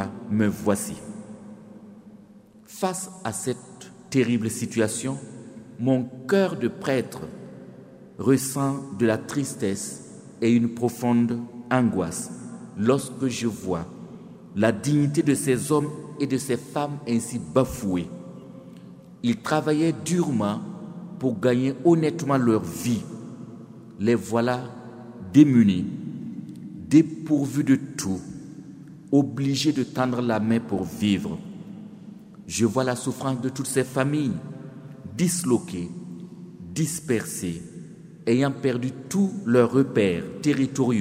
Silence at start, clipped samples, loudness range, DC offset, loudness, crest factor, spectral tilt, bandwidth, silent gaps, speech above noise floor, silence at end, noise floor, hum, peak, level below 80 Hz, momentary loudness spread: 0 s; under 0.1%; 5 LU; under 0.1%; -24 LUFS; 22 dB; -6 dB/octave; 16 kHz; none; 27 dB; 0 s; -50 dBFS; none; -2 dBFS; -58 dBFS; 20 LU